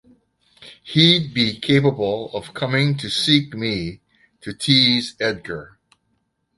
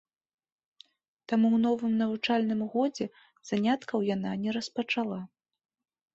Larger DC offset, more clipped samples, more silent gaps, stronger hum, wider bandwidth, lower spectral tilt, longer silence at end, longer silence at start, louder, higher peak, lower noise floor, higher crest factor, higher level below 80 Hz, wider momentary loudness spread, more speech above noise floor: neither; neither; neither; neither; first, 11.5 kHz vs 7.8 kHz; about the same, -5 dB/octave vs -6 dB/octave; about the same, 0.9 s vs 0.9 s; second, 0.6 s vs 1.3 s; first, -18 LUFS vs -29 LUFS; first, 0 dBFS vs -14 dBFS; first, -70 dBFS vs -61 dBFS; about the same, 20 dB vs 16 dB; first, -54 dBFS vs -72 dBFS; first, 17 LU vs 10 LU; first, 50 dB vs 32 dB